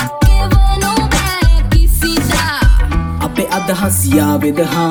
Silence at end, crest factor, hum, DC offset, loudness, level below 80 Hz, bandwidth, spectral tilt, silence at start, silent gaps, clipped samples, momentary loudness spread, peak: 0 s; 10 dB; none; under 0.1%; -13 LUFS; -14 dBFS; over 20 kHz; -5 dB/octave; 0 s; none; under 0.1%; 4 LU; 0 dBFS